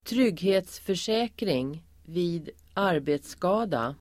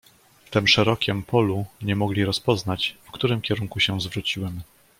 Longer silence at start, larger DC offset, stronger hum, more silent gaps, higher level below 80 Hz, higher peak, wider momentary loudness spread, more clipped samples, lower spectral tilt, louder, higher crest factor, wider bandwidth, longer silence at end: second, 0.05 s vs 0.5 s; neither; neither; neither; second, -58 dBFS vs -52 dBFS; second, -12 dBFS vs -4 dBFS; about the same, 10 LU vs 9 LU; neither; about the same, -5.5 dB/octave vs -5 dB/octave; second, -28 LUFS vs -23 LUFS; about the same, 16 dB vs 20 dB; about the same, 16 kHz vs 16.5 kHz; second, 0.05 s vs 0.35 s